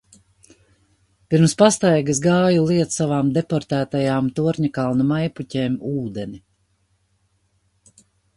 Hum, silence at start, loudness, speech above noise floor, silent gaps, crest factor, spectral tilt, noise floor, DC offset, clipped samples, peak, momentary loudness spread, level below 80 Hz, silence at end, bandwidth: 50 Hz at -55 dBFS; 1.3 s; -19 LUFS; 47 dB; none; 20 dB; -6 dB/octave; -65 dBFS; under 0.1%; under 0.1%; 0 dBFS; 10 LU; -56 dBFS; 2 s; 11.5 kHz